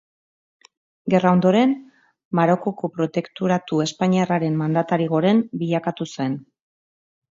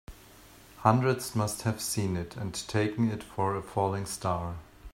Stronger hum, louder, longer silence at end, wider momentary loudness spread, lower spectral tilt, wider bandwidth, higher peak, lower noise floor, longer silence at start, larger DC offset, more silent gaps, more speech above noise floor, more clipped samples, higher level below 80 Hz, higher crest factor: neither; first, -21 LUFS vs -30 LUFS; first, 0.95 s vs 0.05 s; about the same, 10 LU vs 9 LU; first, -7 dB/octave vs -5.5 dB/octave; second, 7.8 kHz vs 16 kHz; about the same, -4 dBFS vs -6 dBFS; first, under -90 dBFS vs -53 dBFS; first, 1.05 s vs 0.1 s; neither; first, 2.25-2.31 s vs none; first, over 70 dB vs 24 dB; neither; second, -66 dBFS vs -56 dBFS; second, 18 dB vs 26 dB